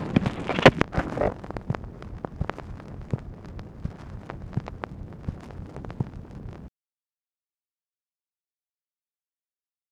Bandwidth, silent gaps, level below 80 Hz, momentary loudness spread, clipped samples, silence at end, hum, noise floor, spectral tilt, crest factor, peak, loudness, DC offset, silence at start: 12 kHz; none; -42 dBFS; 21 LU; under 0.1%; 3.25 s; none; under -90 dBFS; -6.5 dB/octave; 30 dB; 0 dBFS; -28 LUFS; under 0.1%; 0 s